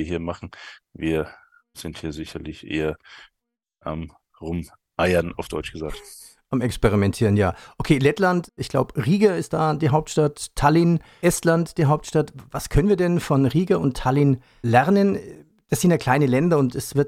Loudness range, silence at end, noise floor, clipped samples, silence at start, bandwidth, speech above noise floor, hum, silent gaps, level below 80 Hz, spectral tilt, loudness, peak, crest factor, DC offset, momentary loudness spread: 10 LU; 0 s; -82 dBFS; under 0.1%; 0 s; 16 kHz; 61 dB; none; none; -40 dBFS; -6.5 dB/octave; -21 LUFS; -4 dBFS; 18 dB; under 0.1%; 15 LU